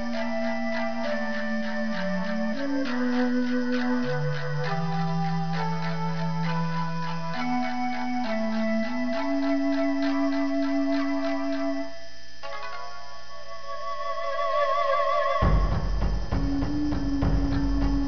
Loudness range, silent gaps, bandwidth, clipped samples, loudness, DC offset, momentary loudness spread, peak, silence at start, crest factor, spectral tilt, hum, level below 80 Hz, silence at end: 4 LU; none; 5.4 kHz; under 0.1%; -27 LUFS; 3%; 11 LU; -10 dBFS; 0 s; 16 dB; -7 dB/octave; 60 Hz at -55 dBFS; -36 dBFS; 0 s